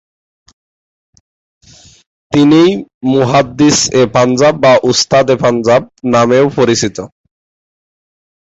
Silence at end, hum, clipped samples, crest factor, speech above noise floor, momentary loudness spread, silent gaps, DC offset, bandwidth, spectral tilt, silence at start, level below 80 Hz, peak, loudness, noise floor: 1.4 s; none; under 0.1%; 12 dB; over 81 dB; 7 LU; 2.94-3.01 s; under 0.1%; 8 kHz; -4.5 dB/octave; 2.3 s; -46 dBFS; 0 dBFS; -10 LUFS; under -90 dBFS